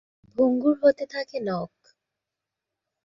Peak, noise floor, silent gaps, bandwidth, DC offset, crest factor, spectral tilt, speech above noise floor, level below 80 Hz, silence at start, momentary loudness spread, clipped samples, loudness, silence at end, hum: -8 dBFS; -86 dBFS; none; 7.2 kHz; under 0.1%; 18 dB; -7.5 dB/octave; 63 dB; -68 dBFS; 0.4 s; 14 LU; under 0.1%; -24 LUFS; 1.4 s; none